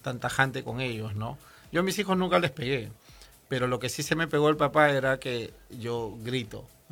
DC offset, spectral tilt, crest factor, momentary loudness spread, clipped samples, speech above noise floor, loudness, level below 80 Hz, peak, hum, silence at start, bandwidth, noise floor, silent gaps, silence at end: under 0.1%; -5 dB/octave; 22 dB; 15 LU; under 0.1%; 25 dB; -28 LUFS; -56 dBFS; -6 dBFS; none; 0.05 s; 19.5 kHz; -53 dBFS; none; 0.25 s